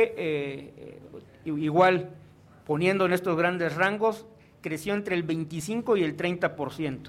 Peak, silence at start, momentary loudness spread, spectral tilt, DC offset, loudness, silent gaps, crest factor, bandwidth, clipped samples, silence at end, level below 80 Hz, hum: -8 dBFS; 0 s; 19 LU; -6 dB/octave; under 0.1%; -27 LUFS; none; 20 dB; 15.5 kHz; under 0.1%; 0 s; -64 dBFS; none